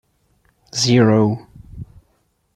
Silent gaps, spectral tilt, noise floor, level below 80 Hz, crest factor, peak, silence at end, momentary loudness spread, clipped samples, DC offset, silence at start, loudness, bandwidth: none; -5.5 dB/octave; -64 dBFS; -50 dBFS; 18 dB; -2 dBFS; 0.7 s; 25 LU; under 0.1%; under 0.1%; 0.75 s; -16 LUFS; 12 kHz